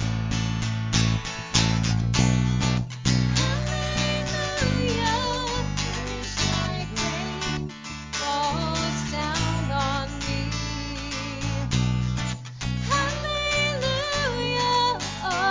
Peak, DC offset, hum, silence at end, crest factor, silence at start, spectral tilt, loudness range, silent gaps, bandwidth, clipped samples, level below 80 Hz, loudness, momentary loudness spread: -4 dBFS; under 0.1%; none; 0 s; 20 dB; 0 s; -4.5 dB/octave; 4 LU; none; 7.8 kHz; under 0.1%; -36 dBFS; -25 LUFS; 7 LU